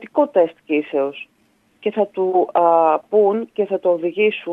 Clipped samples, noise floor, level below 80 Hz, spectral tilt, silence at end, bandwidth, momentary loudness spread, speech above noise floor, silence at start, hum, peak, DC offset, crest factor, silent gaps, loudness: under 0.1%; -60 dBFS; -76 dBFS; -8 dB/octave; 0 s; 3.9 kHz; 8 LU; 42 dB; 0 s; none; -2 dBFS; under 0.1%; 16 dB; none; -18 LUFS